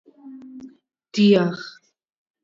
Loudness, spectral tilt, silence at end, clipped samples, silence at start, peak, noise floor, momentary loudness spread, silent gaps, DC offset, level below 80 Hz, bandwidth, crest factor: -19 LUFS; -6.5 dB/octave; 0.75 s; under 0.1%; 0.25 s; -4 dBFS; -48 dBFS; 26 LU; none; under 0.1%; -70 dBFS; 7.4 kHz; 18 dB